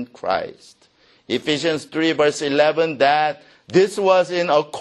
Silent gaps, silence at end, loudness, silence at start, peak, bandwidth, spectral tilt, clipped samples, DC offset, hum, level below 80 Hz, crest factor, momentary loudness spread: none; 0 s; -19 LUFS; 0 s; -2 dBFS; 12 kHz; -4.5 dB/octave; under 0.1%; under 0.1%; none; -62 dBFS; 18 dB; 8 LU